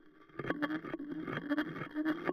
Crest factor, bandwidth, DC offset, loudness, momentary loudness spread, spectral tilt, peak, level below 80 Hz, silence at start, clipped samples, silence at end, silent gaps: 20 dB; 13.5 kHz; under 0.1%; -38 LUFS; 6 LU; -7.5 dB/octave; -18 dBFS; -68 dBFS; 0.05 s; under 0.1%; 0 s; none